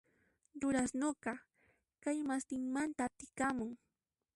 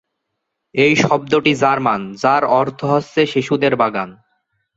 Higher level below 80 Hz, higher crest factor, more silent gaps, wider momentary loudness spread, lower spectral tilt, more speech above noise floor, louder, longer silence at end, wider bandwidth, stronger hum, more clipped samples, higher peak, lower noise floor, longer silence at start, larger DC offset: second, -70 dBFS vs -58 dBFS; about the same, 16 dB vs 16 dB; neither; first, 11 LU vs 5 LU; second, -4 dB/octave vs -5.5 dB/octave; second, 51 dB vs 60 dB; second, -39 LUFS vs -16 LUFS; about the same, 0.6 s vs 0.65 s; first, 11.5 kHz vs 8 kHz; neither; neither; second, -24 dBFS vs -2 dBFS; first, -89 dBFS vs -75 dBFS; second, 0.55 s vs 0.75 s; neither